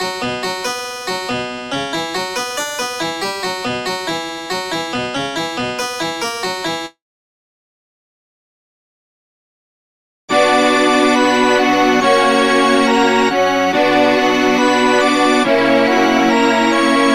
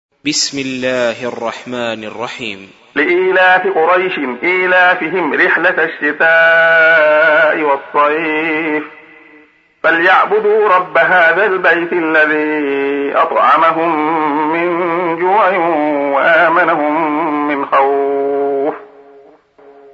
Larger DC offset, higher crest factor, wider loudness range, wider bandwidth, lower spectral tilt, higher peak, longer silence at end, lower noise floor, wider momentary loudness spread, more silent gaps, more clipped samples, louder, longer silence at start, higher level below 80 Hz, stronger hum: first, 0.2% vs under 0.1%; about the same, 16 dB vs 12 dB; first, 11 LU vs 4 LU; first, 16.5 kHz vs 8 kHz; about the same, -3 dB/octave vs -3.5 dB/octave; about the same, 0 dBFS vs 0 dBFS; second, 0 s vs 1.1 s; first, under -90 dBFS vs -46 dBFS; about the same, 9 LU vs 11 LU; first, 7.02-10.28 s vs none; neither; second, -15 LUFS vs -12 LUFS; second, 0 s vs 0.25 s; first, -52 dBFS vs -64 dBFS; neither